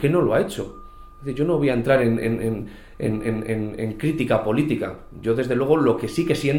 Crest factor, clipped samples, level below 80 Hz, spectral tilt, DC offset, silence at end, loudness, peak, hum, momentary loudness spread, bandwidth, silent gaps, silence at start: 18 dB; under 0.1%; -44 dBFS; -7 dB/octave; under 0.1%; 0 s; -22 LUFS; -4 dBFS; none; 13 LU; 16.5 kHz; none; 0 s